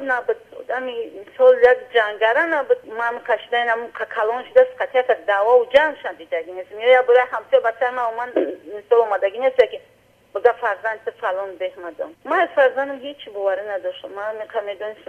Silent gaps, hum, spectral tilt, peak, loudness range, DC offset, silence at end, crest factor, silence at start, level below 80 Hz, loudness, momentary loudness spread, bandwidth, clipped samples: none; 50 Hz at -70 dBFS; -3.5 dB/octave; -2 dBFS; 5 LU; under 0.1%; 0.15 s; 18 dB; 0 s; -64 dBFS; -19 LUFS; 14 LU; 5.6 kHz; under 0.1%